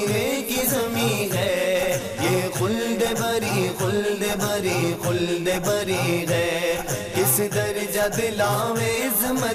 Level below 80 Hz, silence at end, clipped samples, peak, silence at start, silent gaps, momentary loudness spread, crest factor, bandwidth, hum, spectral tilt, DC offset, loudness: -50 dBFS; 0 s; under 0.1%; -8 dBFS; 0 s; none; 3 LU; 14 dB; 15.5 kHz; none; -4 dB/octave; under 0.1%; -22 LUFS